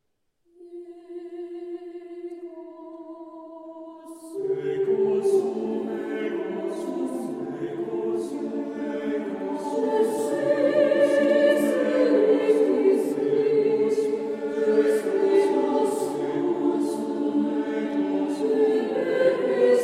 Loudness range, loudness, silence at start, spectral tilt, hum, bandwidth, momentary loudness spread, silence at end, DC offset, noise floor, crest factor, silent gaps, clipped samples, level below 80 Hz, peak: 14 LU; -24 LUFS; 0.6 s; -5.5 dB/octave; none; 14 kHz; 21 LU; 0 s; under 0.1%; -70 dBFS; 16 dB; none; under 0.1%; -74 dBFS; -8 dBFS